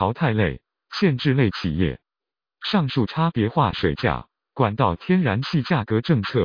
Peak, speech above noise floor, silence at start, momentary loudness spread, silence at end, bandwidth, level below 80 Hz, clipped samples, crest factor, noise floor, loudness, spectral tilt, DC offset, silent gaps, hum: -4 dBFS; over 69 dB; 0 s; 7 LU; 0 s; 5.4 kHz; -44 dBFS; under 0.1%; 18 dB; under -90 dBFS; -22 LUFS; -8 dB/octave; under 0.1%; none; none